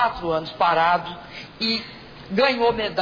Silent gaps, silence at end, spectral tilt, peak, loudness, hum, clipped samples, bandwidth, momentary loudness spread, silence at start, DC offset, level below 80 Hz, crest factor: none; 0 s; -5.5 dB/octave; -8 dBFS; -21 LUFS; none; under 0.1%; 5.4 kHz; 18 LU; 0 s; under 0.1%; -50 dBFS; 16 dB